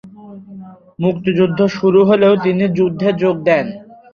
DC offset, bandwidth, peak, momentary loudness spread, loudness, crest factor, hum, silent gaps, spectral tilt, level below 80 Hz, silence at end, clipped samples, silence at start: under 0.1%; 6.8 kHz; -2 dBFS; 14 LU; -14 LUFS; 14 dB; none; none; -8 dB/octave; -54 dBFS; 0.3 s; under 0.1%; 0.05 s